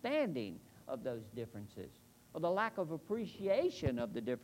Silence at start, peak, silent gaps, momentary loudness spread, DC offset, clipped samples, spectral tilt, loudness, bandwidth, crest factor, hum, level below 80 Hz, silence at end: 0.05 s; -22 dBFS; none; 16 LU; under 0.1%; under 0.1%; -6.5 dB/octave; -39 LUFS; 16 kHz; 18 dB; none; -64 dBFS; 0 s